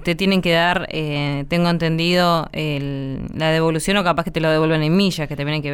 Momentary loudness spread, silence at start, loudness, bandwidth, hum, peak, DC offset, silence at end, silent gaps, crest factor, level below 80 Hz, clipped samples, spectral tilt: 7 LU; 0 s; -19 LUFS; 17.5 kHz; none; -4 dBFS; under 0.1%; 0 s; none; 14 dB; -40 dBFS; under 0.1%; -5.5 dB/octave